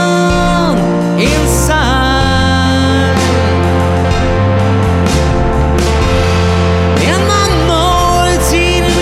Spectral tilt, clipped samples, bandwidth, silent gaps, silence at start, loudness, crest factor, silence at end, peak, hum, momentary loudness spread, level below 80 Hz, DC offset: -5 dB/octave; under 0.1%; 15.5 kHz; none; 0 s; -11 LUFS; 10 dB; 0 s; 0 dBFS; none; 2 LU; -18 dBFS; under 0.1%